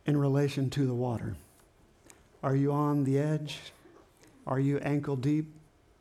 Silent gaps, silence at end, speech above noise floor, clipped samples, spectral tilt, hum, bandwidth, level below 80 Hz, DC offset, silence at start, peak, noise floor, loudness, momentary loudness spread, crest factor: none; 0.4 s; 33 dB; under 0.1%; -8 dB/octave; none; 12.5 kHz; -62 dBFS; under 0.1%; 0.05 s; -16 dBFS; -62 dBFS; -30 LUFS; 15 LU; 16 dB